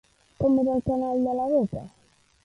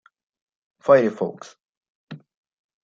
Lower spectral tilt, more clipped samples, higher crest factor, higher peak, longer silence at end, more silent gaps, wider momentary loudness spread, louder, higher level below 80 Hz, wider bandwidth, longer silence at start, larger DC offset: first, -10 dB/octave vs -7 dB/octave; neither; second, 14 dB vs 22 dB; second, -12 dBFS vs -2 dBFS; about the same, 0.55 s vs 0.65 s; second, none vs 1.69-1.81 s, 1.89-2.07 s; second, 6 LU vs 26 LU; second, -25 LUFS vs -20 LUFS; first, -52 dBFS vs -72 dBFS; first, 9.8 kHz vs 7.4 kHz; second, 0.4 s vs 0.85 s; neither